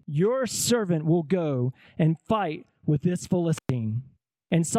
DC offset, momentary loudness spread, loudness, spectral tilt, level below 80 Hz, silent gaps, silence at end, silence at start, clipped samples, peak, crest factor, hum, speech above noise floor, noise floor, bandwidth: under 0.1%; 7 LU; -26 LUFS; -6 dB/octave; -60 dBFS; none; 0 s; 0.1 s; under 0.1%; -10 dBFS; 16 dB; none; 30 dB; -54 dBFS; 15.5 kHz